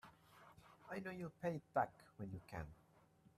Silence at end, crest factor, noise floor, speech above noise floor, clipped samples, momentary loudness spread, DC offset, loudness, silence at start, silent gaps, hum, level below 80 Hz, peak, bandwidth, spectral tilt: 0.1 s; 24 dB; -71 dBFS; 25 dB; under 0.1%; 22 LU; under 0.1%; -47 LUFS; 0.05 s; none; none; -72 dBFS; -26 dBFS; 13.5 kHz; -7.5 dB/octave